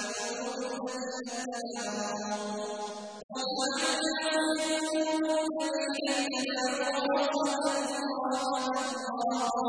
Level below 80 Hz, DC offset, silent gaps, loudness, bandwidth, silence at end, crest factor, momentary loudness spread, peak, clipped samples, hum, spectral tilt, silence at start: -74 dBFS; under 0.1%; 3.24-3.29 s; -31 LUFS; 10.5 kHz; 0 s; 16 dB; 8 LU; -16 dBFS; under 0.1%; none; -2 dB/octave; 0 s